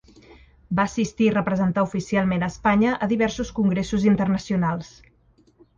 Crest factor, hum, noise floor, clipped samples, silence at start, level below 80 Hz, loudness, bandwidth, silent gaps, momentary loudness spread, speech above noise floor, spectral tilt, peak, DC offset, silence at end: 16 dB; none; -59 dBFS; under 0.1%; 0.7 s; -46 dBFS; -22 LUFS; 7.6 kHz; none; 4 LU; 37 dB; -6.5 dB/octave; -6 dBFS; under 0.1%; 0.9 s